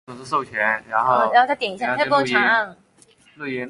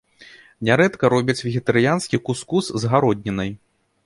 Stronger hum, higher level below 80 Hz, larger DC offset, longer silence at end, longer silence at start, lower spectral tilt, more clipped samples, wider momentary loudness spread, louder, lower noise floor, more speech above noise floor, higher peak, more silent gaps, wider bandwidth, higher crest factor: neither; second, -64 dBFS vs -52 dBFS; neither; second, 0 s vs 0.5 s; about the same, 0.1 s vs 0.2 s; second, -4.5 dB/octave vs -6 dB/octave; neither; about the same, 10 LU vs 9 LU; about the same, -19 LUFS vs -20 LUFS; first, -54 dBFS vs -47 dBFS; first, 34 dB vs 28 dB; about the same, -2 dBFS vs -2 dBFS; neither; about the same, 11.5 kHz vs 11.5 kHz; about the same, 18 dB vs 18 dB